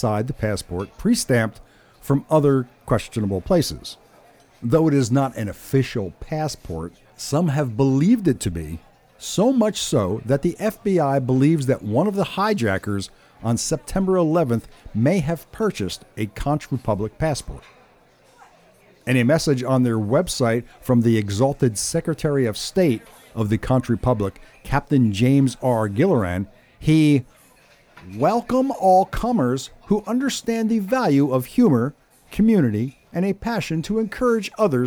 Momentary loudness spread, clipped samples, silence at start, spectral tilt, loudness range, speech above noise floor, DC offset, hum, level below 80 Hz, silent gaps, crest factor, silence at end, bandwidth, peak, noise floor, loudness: 11 LU; under 0.1%; 0 s; -6 dB/octave; 3 LU; 34 dB; under 0.1%; none; -42 dBFS; none; 14 dB; 0 s; 20 kHz; -6 dBFS; -54 dBFS; -21 LUFS